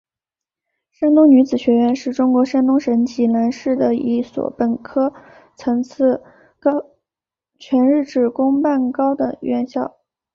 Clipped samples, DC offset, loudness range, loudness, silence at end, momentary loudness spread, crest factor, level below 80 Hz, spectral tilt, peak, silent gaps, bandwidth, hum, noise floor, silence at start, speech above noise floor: under 0.1%; under 0.1%; 6 LU; -17 LUFS; 0.45 s; 9 LU; 16 dB; -60 dBFS; -7 dB/octave; -2 dBFS; none; 7 kHz; none; -88 dBFS; 1 s; 72 dB